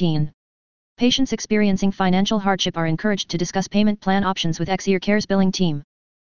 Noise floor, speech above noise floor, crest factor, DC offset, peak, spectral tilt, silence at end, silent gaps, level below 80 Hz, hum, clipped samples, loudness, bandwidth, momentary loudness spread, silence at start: under -90 dBFS; over 70 dB; 16 dB; 2%; -4 dBFS; -5 dB/octave; 0.4 s; 0.34-0.96 s; -48 dBFS; none; under 0.1%; -20 LUFS; 7.2 kHz; 5 LU; 0 s